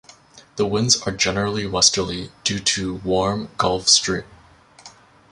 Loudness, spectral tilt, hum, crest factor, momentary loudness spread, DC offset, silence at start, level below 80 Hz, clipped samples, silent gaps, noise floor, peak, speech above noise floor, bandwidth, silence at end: -19 LUFS; -2.5 dB/octave; none; 22 dB; 10 LU; under 0.1%; 0.35 s; -46 dBFS; under 0.1%; none; -48 dBFS; 0 dBFS; 28 dB; 16 kHz; 0.45 s